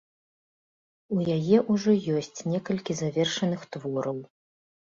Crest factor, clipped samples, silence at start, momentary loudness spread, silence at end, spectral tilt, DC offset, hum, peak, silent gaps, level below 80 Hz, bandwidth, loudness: 20 dB; under 0.1%; 1.1 s; 10 LU; 0.65 s; -6 dB/octave; under 0.1%; none; -8 dBFS; none; -66 dBFS; 7.6 kHz; -27 LUFS